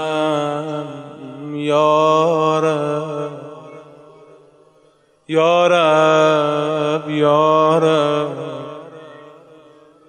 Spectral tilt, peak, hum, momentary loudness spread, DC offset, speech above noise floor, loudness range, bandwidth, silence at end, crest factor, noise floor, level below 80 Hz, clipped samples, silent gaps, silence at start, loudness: -5.5 dB/octave; -2 dBFS; none; 20 LU; under 0.1%; 41 dB; 6 LU; 9.6 kHz; 0.8 s; 16 dB; -55 dBFS; -70 dBFS; under 0.1%; none; 0 s; -16 LUFS